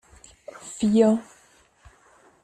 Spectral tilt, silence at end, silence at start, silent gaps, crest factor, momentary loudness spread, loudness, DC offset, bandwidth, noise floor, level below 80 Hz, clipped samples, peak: -6.5 dB/octave; 1.2 s; 0.65 s; none; 20 dB; 25 LU; -22 LUFS; under 0.1%; 10 kHz; -58 dBFS; -60 dBFS; under 0.1%; -6 dBFS